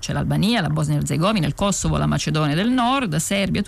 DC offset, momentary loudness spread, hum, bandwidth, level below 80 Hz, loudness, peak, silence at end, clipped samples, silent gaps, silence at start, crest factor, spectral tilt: under 0.1%; 2 LU; none; 15 kHz; -38 dBFS; -20 LUFS; -10 dBFS; 0 s; under 0.1%; none; 0 s; 10 dB; -5 dB/octave